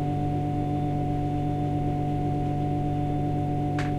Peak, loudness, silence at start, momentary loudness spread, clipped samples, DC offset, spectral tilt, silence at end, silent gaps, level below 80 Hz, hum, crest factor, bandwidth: -16 dBFS; -27 LUFS; 0 s; 0 LU; under 0.1%; under 0.1%; -9 dB/octave; 0 s; none; -38 dBFS; none; 10 dB; 8.8 kHz